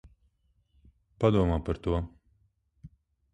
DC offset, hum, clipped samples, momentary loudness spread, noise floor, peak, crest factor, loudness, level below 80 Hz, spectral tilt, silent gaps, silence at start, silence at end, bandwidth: under 0.1%; none; under 0.1%; 8 LU; -70 dBFS; -10 dBFS; 22 dB; -28 LUFS; -42 dBFS; -9 dB/octave; none; 1.2 s; 0.45 s; 9.6 kHz